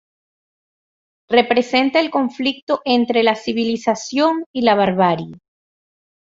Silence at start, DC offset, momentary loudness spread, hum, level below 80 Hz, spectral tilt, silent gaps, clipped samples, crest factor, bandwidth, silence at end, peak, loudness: 1.3 s; under 0.1%; 6 LU; none; -60 dBFS; -5 dB/octave; 2.62-2.67 s, 4.46-4.54 s; under 0.1%; 18 dB; 7.8 kHz; 0.95 s; -2 dBFS; -17 LUFS